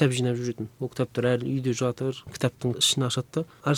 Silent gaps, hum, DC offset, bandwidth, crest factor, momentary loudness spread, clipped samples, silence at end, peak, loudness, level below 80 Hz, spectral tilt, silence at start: none; none; under 0.1%; 16.5 kHz; 20 dB; 10 LU; under 0.1%; 0 s; -6 dBFS; -27 LUFS; -62 dBFS; -4.5 dB/octave; 0 s